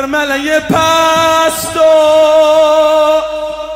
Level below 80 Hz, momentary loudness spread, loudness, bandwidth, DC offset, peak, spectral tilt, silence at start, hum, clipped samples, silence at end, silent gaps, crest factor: -42 dBFS; 6 LU; -9 LUFS; 16.5 kHz; under 0.1%; 0 dBFS; -3 dB/octave; 0 s; none; under 0.1%; 0 s; none; 8 dB